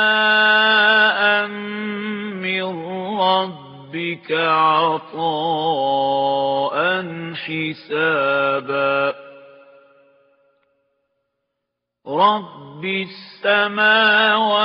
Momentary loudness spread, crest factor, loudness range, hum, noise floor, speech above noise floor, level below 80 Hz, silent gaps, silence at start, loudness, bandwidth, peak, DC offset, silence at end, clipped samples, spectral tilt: 14 LU; 18 dB; 8 LU; none; -79 dBFS; 61 dB; -72 dBFS; none; 0 s; -18 LUFS; 5.4 kHz; -2 dBFS; under 0.1%; 0 s; under 0.1%; -0.5 dB/octave